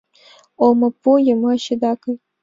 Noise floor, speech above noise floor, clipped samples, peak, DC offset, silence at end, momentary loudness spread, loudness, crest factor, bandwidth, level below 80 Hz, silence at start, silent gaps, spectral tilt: -50 dBFS; 34 dB; under 0.1%; -2 dBFS; under 0.1%; 0.25 s; 8 LU; -17 LUFS; 16 dB; 7.6 kHz; -64 dBFS; 0.6 s; none; -6 dB/octave